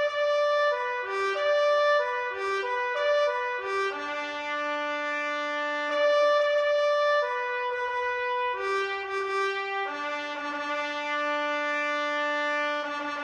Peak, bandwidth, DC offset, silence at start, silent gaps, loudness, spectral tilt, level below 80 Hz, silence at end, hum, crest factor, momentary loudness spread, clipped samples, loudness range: -14 dBFS; 9.4 kHz; under 0.1%; 0 s; none; -27 LUFS; -1.5 dB/octave; -72 dBFS; 0 s; none; 14 dB; 7 LU; under 0.1%; 4 LU